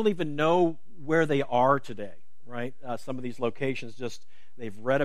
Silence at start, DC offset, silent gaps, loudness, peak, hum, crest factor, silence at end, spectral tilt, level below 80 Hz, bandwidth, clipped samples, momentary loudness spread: 0 s; 2%; none; -28 LUFS; -8 dBFS; none; 20 dB; 0 s; -6.5 dB/octave; -68 dBFS; 13.5 kHz; under 0.1%; 18 LU